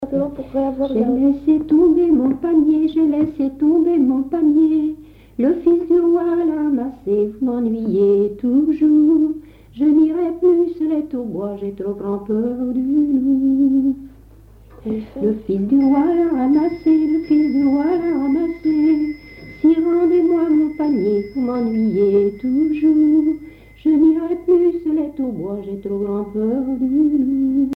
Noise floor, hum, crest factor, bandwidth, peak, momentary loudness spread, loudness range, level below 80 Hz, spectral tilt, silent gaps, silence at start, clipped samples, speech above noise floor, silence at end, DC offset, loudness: -44 dBFS; none; 12 dB; 5.4 kHz; -6 dBFS; 9 LU; 3 LU; -48 dBFS; -10 dB/octave; none; 0 s; under 0.1%; 28 dB; 0 s; under 0.1%; -17 LUFS